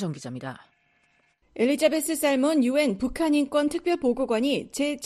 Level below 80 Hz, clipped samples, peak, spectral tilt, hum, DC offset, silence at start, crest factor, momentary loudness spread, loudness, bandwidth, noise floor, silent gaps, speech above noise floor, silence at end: -54 dBFS; under 0.1%; -8 dBFS; -4.5 dB/octave; none; under 0.1%; 0 s; 18 dB; 13 LU; -24 LUFS; 13.5 kHz; -66 dBFS; none; 42 dB; 0 s